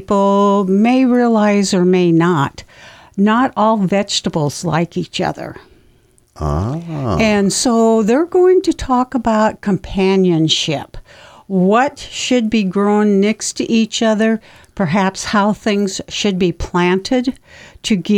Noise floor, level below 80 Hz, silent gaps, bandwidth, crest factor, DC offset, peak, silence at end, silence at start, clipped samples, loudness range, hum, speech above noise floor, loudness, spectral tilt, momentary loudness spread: -52 dBFS; -38 dBFS; none; 14.5 kHz; 14 dB; under 0.1%; -2 dBFS; 0 s; 0 s; under 0.1%; 4 LU; none; 37 dB; -15 LUFS; -5 dB/octave; 9 LU